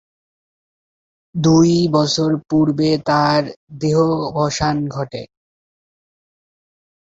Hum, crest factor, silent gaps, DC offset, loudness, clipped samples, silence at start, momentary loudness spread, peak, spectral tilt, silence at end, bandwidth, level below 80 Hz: none; 16 dB; 3.56-3.67 s; under 0.1%; -17 LUFS; under 0.1%; 1.35 s; 13 LU; -2 dBFS; -6 dB/octave; 1.8 s; 7.8 kHz; -48 dBFS